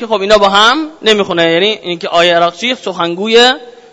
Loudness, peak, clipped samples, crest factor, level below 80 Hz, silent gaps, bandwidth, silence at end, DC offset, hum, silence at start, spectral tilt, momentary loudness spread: -10 LUFS; 0 dBFS; 0.6%; 10 dB; -48 dBFS; none; 11 kHz; 0.2 s; under 0.1%; none; 0 s; -3.5 dB/octave; 8 LU